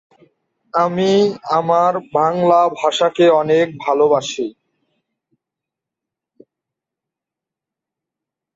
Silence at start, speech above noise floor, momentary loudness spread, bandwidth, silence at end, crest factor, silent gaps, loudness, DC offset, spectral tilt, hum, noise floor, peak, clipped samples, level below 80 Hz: 0.75 s; 71 dB; 6 LU; 7.8 kHz; 4.05 s; 16 dB; none; -16 LUFS; under 0.1%; -5.5 dB/octave; none; -86 dBFS; -2 dBFS; under 0.1%; -64 dBFS